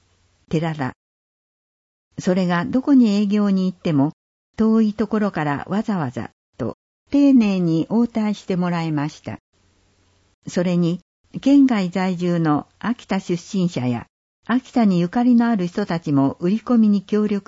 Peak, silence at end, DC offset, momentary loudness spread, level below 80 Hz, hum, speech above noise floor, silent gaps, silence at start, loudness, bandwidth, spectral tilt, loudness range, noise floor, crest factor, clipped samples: -6 dBFS; 0.1 s; under 0.1%; 13 LU; -56 dBFS; none; 42 dB; 0.96-2.11 s, 4.13-4.54 s, 6.33-6.53 s, 6.74-7.06 s, 9.40-9.53 s, 10.34-10.42 s, 11.02-11.24 s, 14.09-14.43 s; 0.5 s; -20 LUFS; 8 kHz; -7.5 dB/octave; 4 LU; -60 dBFS; 14 dB; under 0.1%